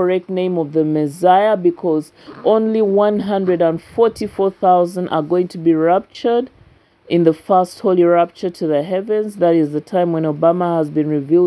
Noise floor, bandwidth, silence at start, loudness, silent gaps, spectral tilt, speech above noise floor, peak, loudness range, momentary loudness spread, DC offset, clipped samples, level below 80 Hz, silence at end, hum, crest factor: -50 dBFS; 11 kHz; 0 s; -16 LUFS; none; -8 dB/octave; 34 dB; 0 dBFS; 1 LU; 6 LU; under 0.1%; under 0.1%; -58 dBFS; 0 s; none; 16 dB